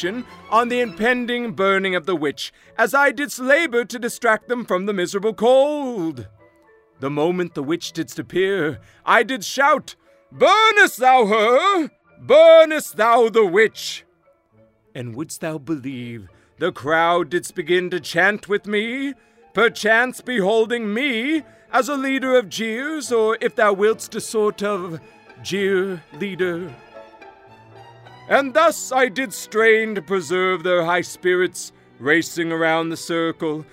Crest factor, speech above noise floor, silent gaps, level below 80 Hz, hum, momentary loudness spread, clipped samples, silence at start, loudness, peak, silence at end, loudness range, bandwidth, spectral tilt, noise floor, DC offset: 20 dB; 40 dB; none; -64 dBFS; none; 13 LU; under 0.1%; 0 s; -19 LUFS; 0 dBFS; 0.1 s; 9 LU; 16 kHz; -4 dB/octave; -59 dBFS; under 0.1%